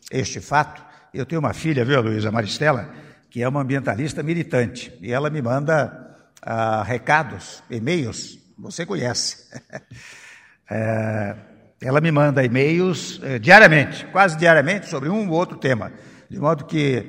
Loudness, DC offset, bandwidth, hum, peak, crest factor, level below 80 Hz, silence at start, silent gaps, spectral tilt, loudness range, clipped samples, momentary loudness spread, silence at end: -19 LUFS; under 0.1%; 15 kHz; none; 0 dBFS; 20 dB; -56 dBFS; 0.1 s; none; -5.5 dB/octave; 12 LU; under 0.1%; 20 LU; 0 s